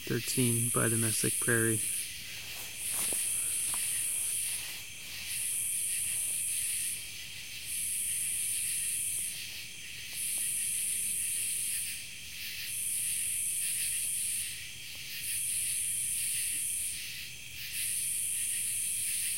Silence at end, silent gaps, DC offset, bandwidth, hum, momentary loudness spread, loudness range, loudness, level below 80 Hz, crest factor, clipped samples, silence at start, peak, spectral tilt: 0 s; none; 0.3%; 16.5 kHz; none; 12 LU; 3 LU; -31 LUFS; -64 dBFS; 20 dB; under 0.1%; 0 s; -14 dBFS; -1.5 dB/octave